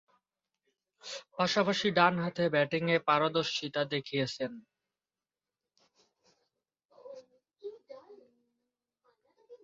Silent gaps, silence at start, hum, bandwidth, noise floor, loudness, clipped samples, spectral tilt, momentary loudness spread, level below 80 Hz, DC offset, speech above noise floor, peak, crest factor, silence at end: 6.85-6.89 s; 1.05 s; none; 7.8 kHz; under -90 dBFS; -30 LUFS; under 0.1%; -5 dB/octave; 21 LU; -76 dBFS; under 0.1%; over 60 dB; -10 dBFS; 24 dB; 0.1 s